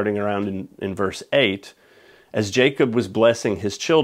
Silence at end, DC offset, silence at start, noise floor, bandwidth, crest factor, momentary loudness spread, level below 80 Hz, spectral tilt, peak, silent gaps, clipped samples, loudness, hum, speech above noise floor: 0 s; under 0.1%; 0 s; -52 dBFS; 15 kHz; 20 dB; 11 LU; -60 dBFS; -5 dB/octave; -2 dBFS; none; under 0.1%; -21 LUFS; none; 31 dB